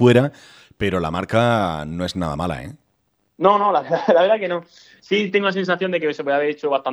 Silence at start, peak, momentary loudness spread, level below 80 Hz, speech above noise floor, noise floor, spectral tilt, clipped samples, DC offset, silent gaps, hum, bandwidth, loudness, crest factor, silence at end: 0 s; -2 dBFS; 10 LU; -48 dBFS; 49 dB; -68 dBFS; -6.5 dB/octave; under 0.1%; under 0.1%; none; none; 12.5 kHz; -20 LUFS; 18 dB; 0 s